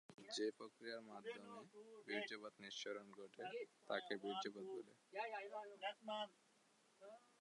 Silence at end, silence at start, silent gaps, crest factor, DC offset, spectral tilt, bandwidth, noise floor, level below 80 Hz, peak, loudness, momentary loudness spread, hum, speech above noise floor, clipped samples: 0.1 s; 0.1 s; none; 20 dB; under 0.1%; -3 dB/octave; 11 kHz; -77 dBFS; under -90 dBFS; -30 dBFS; -51 LUFS; 13 LU; none; 26 dB; under 0.1%